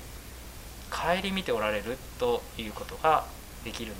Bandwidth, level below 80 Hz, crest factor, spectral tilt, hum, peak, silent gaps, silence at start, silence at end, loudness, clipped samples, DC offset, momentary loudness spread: 16 kHz; -46 dBFS; 22 dB; -4 dB/octave; none; -10 dBFS; none; 0 s; 0 s; -30 LUFS; under 0.1%; under 0.1%; 18 LU